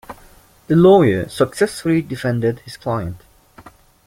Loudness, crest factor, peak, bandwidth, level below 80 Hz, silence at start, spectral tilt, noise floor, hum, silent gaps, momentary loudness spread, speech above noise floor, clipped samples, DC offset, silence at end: -17 LUFS; 16 dB; -2 dBFS; 16 kHz; -48 dBFS; 0.1 s; -7 dB/octave; -48 dBFS; none; none; 13 LU; 32 dB; under 0.1%; under 0.1%; 0.9 s